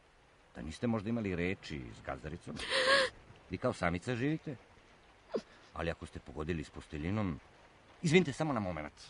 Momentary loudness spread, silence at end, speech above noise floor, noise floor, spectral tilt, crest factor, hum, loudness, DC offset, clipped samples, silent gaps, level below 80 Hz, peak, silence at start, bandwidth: 17 LU; 0 s; 29 dB; -64 dBFS; -5 dB/octave; 24 dB; none; -35 LUFS; under 0.1%; under 0.1%; none; -56 dBFS; -12 dBFS; 0.55 s; 10.5 kHz